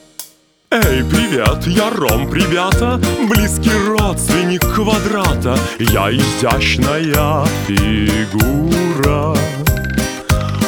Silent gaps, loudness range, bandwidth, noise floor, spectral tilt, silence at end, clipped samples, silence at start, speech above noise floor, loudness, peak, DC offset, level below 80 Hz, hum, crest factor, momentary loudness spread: none; 1 LU; over 20 kHz; -42 dBFS; -5 dB/octave; 0 s; under 0.1%; 0.2 s; 28 dB; -14 LUFS; 0 dBFS; under 0.1%; -24 dBFS; none; 14 dB; 4 LU